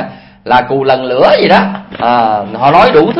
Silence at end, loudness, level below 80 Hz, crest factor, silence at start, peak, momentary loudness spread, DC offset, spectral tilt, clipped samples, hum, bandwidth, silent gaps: 0 s; -9 LUFS; -42 dBFS; 10 dB; 0 s; 0 dBFS; 10 LU; under 0.1%; -7 dB/octave; 0.6%; none; 8.4 kHz; none